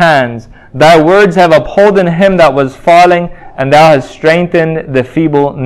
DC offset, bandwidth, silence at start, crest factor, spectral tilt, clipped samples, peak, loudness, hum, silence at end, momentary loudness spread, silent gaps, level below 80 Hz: under 0.1%; 14.5 kHz; 0 s; 8 dB; -6 dB/octave; 4%; 0 dBFS; -7 LUFS; none; 0 s; 8 LU; none; -38 dBFS